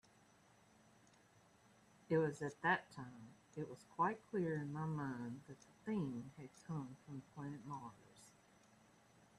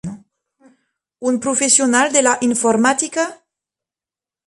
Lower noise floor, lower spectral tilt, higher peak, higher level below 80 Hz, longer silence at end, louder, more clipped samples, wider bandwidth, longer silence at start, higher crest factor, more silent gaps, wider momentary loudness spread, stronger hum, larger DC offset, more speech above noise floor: second, -70 dBFS vs under -90 dBFS; first, -7 dB/octave vs -2 dB/octave; second, -22 dBFS vs 0 dBFS; second, -80 dBFS vs -62 dBFS; about the same, 1.1 s vs 1.1 s; second, -44 LUFS vs -15 LUFS; neither; about the same, 12.5 kHz vs 11.5 kHz; first, 2.1 s vs 0.05 s; first, 24 dB vs 18 dB; neither; first, 19 LU vs 11 LU; neither; neither; second, 27 dB vs over 74 dB